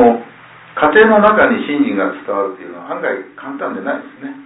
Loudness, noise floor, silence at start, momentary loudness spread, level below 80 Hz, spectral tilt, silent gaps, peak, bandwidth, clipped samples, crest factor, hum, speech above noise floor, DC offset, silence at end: -14 LUFS; -39 dBFS; 0 s; 18 LU; -50 dBFS; -9.5 dB/octave; none; 0 dBFS; 4 kHz; under 0.1%; 14 dB; none; 24 dB; under 0.1%; 0 s